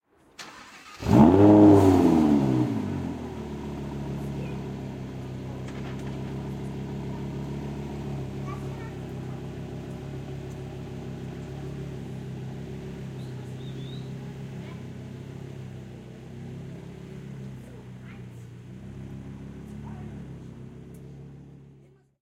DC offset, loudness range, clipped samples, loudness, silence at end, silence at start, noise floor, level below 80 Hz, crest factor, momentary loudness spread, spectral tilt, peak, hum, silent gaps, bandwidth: under 0.1%; 22 LU; under 0.1%; -26 LUFS; 0.45 s; 0.4 s; -56 dBFS; -48 dBFS; 24 dB; 23 LU; -8.5 dB/octave; -4 dBFS; none; none; 14.5 kHz